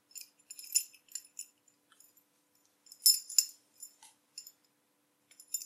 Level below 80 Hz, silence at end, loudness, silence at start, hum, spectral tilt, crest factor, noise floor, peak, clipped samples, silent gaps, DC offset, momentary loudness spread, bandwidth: under -90 dBFS; 0 s; -29 LUFS; 0.15 s; none; 6 dB/octave; 32 dB; -75 dBFS; -6 dBFS; under 0.1%; none; under 0.1%; 26 LU; 15.5 kHz